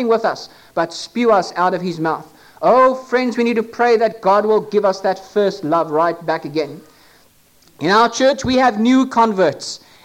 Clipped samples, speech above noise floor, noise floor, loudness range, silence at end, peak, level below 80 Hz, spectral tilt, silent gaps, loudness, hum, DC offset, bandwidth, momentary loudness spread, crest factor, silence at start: under 0.1%; 36 dB; -52 dBFS; 3 LU; 0.3 s; -4 dBFS; -54 dBFS; -5 dB/octave; none; -16 LUFS; none; under 0.1%; 16 kHz; 9 LU; 12 dB; 0 s